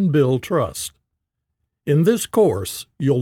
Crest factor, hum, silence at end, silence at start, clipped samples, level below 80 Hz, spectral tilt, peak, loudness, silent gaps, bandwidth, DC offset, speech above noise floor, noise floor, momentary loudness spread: 16 dB; none; 0 s; 0 s; under 0.1%; -54 dBFS; -6 dB/octave; -4 dBFS; -20 LUFS; none; 17.5 kHz; under 0.1%; 59 dB; -78 dBFS; 12 LU